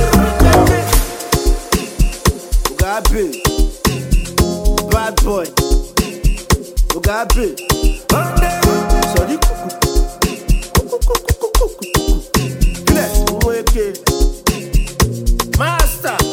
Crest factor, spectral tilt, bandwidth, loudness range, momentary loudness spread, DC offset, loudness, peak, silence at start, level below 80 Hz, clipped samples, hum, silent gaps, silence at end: 14 dB; -4.5 dB/octave; 17 kHz; 1 LU; 5 LU; under 0.1%; -16 LUFS; 0 dBFS; 0 s; -16 dBFS; under 0.1%; none; none; 0 s